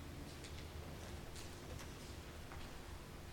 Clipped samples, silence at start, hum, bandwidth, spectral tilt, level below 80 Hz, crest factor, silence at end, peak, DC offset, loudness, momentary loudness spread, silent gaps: under 0.1%; 0 s; none; 17 kHz; -4.5 dB/octave; -56 dBFS; 14 dB; 0 s; -36 dBFS; under 0.1%; -52 LUFS; 2 LU; none